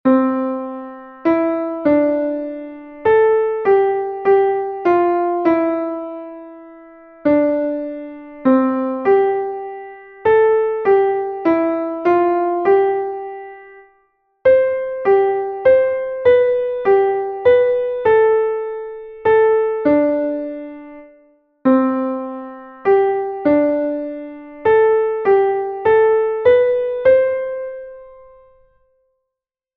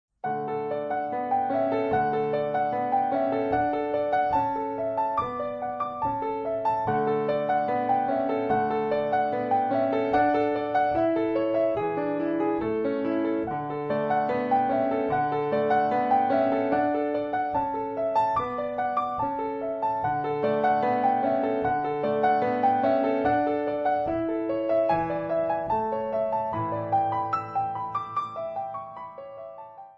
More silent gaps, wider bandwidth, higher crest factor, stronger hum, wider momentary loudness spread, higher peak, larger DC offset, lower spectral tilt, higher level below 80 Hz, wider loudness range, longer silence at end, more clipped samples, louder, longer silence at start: neither; second, 4.7 kHz vs 5.8 kHz; about the same, 14 dB vs 14 dB; neither; first, 16 LU vs 6 LU; first, -2 dBFS vs -12 dBFS; neither; about the same, -8.5 dB/octave vs -8.5 dB/octave; about the same, -56 dBFS vs -58 dBFS; about the same, 4 LU vs 3 LU; first, 1.65 s vs 0.05 s; neither; first, -16 LUFS vs -26 LUFS; second, 0.05 s vs 0.25 s